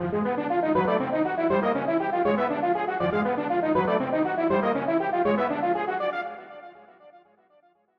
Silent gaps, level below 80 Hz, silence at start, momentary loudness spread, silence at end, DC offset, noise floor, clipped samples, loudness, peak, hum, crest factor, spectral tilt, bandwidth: none; -62 dBFS; 0 s; 4 LU; 0.8 s; under 0.1%; -62 dBFS; under 0.1%; -25 LUFS; -12 dBFS; none; 14 dB; -9 dB/octave; 5.8 kHz